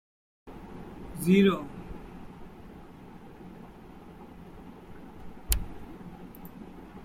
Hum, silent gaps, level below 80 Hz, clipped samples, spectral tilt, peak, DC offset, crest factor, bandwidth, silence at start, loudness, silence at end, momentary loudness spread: none; none; -44 dBFS; under 0.1%; -5.5 dB/octave; -8 dBFS; under 0.1%; 26 dB; 16.5 kHz; 0.45 s; -27 LUFS; 0 s; 24 LU